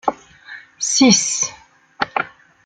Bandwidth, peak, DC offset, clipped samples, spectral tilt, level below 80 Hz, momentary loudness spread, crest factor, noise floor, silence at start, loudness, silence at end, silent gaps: 10 kHz; 0 dBFS; under 0.1%; under 0.1%; -2 dB/octave; -60 dBFS; 25 LU; 20 dB; -40 dBFS; 0.05 s; -17 LUFS; 0.35 s; none